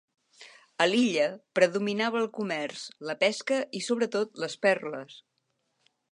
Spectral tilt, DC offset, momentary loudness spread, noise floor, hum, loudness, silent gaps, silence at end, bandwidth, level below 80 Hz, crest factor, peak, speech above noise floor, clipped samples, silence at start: -4 dB/octave; under 0.1%; 13 LU; -77 dBFS; none; -28 LUFS; none; 0.9 s; 11 kHz; -84 dBFS; 22 dB; -8 dBFS; 49 dB; under 0.1%; 0.4 s